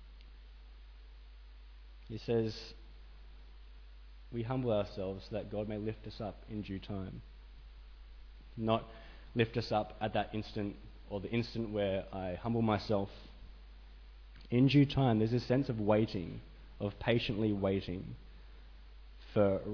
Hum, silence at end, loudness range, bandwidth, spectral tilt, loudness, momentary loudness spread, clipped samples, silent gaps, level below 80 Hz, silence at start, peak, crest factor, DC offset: none; 0 s; 11 LU; 5.4 kHz; -6 dB/octave; -35 LUFS; 25 LU; under 0.1%; none; -52 dBFS; 0 s; -16 dBFS; 20 dB; under 0.1%